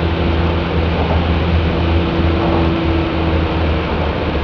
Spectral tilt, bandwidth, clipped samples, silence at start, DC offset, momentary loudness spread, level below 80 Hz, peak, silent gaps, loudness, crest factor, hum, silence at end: -8.5 dB/octave; 5.4 kHz; under 0.1%; 0 s; under 0.1%; 2 LU; -22 dBFS; -2 dBFS; none; -16 LUFS; 12 dB; none; 0 s